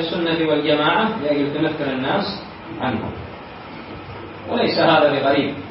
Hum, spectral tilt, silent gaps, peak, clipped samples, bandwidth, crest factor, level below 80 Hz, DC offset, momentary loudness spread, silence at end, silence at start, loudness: none; -10.5 dB/octave; none; -4 dBFS; under 0.1%; 5.8 kHz; 16 dB; -52 dBFS; under 0.1%; 19 LU; 0 s; 0 s; -19 LUFS